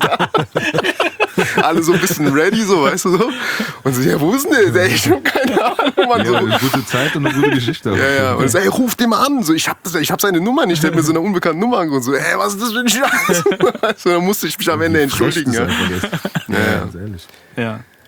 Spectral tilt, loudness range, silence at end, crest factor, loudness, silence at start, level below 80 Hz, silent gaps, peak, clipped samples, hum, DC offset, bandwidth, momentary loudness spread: -4.5 dB/octave; 2 LU; 0.25 s; 14 dB; -15 LUFS; 0 s; -50 dBFS; none; 0 dBFS; under 0.1%; none; under 0.1%; over 20 kHz; 5 LU